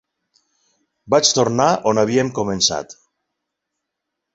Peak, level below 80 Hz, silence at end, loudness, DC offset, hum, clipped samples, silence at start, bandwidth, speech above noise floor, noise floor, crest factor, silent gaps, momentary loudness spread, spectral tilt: 0 dBFS; -54 dBFS; 1.4 s; -17 LUFS; under 0.1%; none; under 0.1%; 1.05 s; 8.2 kHz; 63 dB; -80 dBFS; 20 dB; none; 7 LU; -3.5 dB/octave